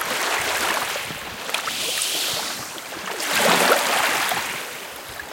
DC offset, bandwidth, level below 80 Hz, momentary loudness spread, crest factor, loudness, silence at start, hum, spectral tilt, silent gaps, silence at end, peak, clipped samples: under 0.1%; 17 kHz; -60 dBFS; 14 LU; 22 dB; -21 LUFS; 0 s; none; -0.5 dB/octave; none; 0 s; -2 dBFS; under 0.1%